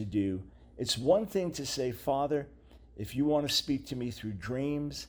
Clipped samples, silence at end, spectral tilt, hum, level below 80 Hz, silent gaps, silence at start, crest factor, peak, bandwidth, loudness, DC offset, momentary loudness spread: under 0.1%; 0 s; -5 dB/octave; none; -56 dBFS; none; 0 s; 18 dB; -14 dBFS; over 20 kHz; -32 LUFS; under 0.1%; 12 LU